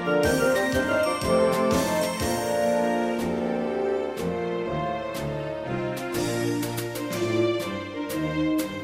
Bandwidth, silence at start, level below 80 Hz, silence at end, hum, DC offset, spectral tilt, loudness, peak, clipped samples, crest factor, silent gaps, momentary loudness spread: 17 kHz; 0 s; -48 dBFS; 0 s; none; under 0.1%; -5 dB/octave; -26 LUFS; -10 dBFS; under 0.1%; 16 dB; none; 8 LU